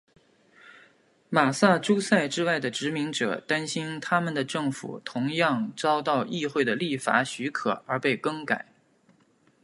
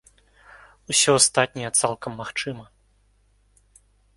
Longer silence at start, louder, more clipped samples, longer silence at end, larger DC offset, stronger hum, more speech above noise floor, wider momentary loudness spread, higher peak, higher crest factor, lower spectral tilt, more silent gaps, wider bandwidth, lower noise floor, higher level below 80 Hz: second, 0.65 s vs 0.9 s; second, -26 LUFS vs -21 LUFS; neither; second, 1 s vs 1.55 s; neither; second, none vs 50 Hz at -60 dBFS; about the same, 37 dB vs 39 dB; second, 7 LU vs 16 LU; about the same, -4 dBFS vs -2 dBFS; about the same, 24 dB vs 24 dB; first, -4.5 dB/octave vs -2 dB/octave; neither; about the same, 11.5 kHz vs 12 kHz; about the same, -64 dBFS vs -62 dBFS; second, -74 dBFS vs -60 dBFS